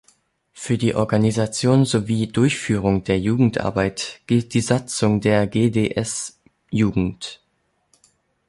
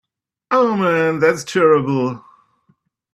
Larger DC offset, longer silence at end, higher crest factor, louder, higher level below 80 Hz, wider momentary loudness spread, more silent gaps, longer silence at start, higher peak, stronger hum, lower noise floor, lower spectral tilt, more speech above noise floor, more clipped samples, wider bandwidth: neither; first, 1.15 s vs 0.95 s; about the same, 18 dB vs 16 dB; second, -20 LUFS vs -16 LUFS; first, -46 dBFS vs -62 dBFS; about the same, 9 LU vs 7 LU; neither; about the same, 0.55 s vs 0.5 s; about the same, -4 dBFS vs -2 dBFS; neither; first, -68 dBFS vs -62 dBFS; about the same, -6 dB/octave vs -6 dB/octave; about the same, 49 dB vs 46 dB; neither; second, 11.5 kHz vs 13 kHz